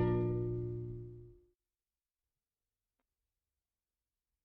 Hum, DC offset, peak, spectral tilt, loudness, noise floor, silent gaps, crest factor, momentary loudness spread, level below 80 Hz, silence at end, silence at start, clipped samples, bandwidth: none; under 0.1%; -22 dBFS; -11.5 dB/octave; -38 LUFS; under -90 dBFS; none; 20 dB; 18 LU; -56 dBFS; 3.1 s; 0 s; under 0.1%; 3.8 kHz